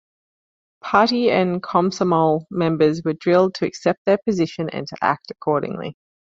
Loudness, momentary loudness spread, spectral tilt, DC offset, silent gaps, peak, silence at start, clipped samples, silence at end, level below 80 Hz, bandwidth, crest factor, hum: -20 LUFS; 9 LU; -6.5 dB/octave; under 0.1%; 3.98-4.05 s; -2 dBFS; 0.85 s; under 0.1%; 0.4 s; -60 dBFS; 7.8 kHz; 18 dB; none